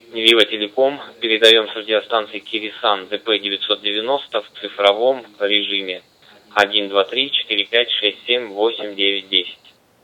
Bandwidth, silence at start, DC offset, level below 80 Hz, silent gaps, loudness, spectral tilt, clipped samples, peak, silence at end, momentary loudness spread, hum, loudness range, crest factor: 18 kHz; 0.1 s; under 0.1%; -72 dBFS; none; -17 LUFS; -2 dB/octave; under 0.1%; 0 dBFS; 0.5 s; 11 LU; none; 3 LU; 18 dB